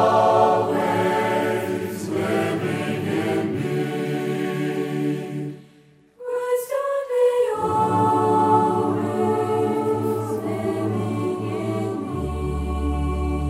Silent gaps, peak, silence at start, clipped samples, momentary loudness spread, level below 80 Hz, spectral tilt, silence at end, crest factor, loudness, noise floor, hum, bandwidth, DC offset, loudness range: none; -4 dBFS; 0 s; under 0.1%; 9 LU; -36 dBFS; -7 dB/octave; 0 s; 18 dB; -22 LUFS; -53 dBFS; none; 16 kHz; under 0.1%; 6 LU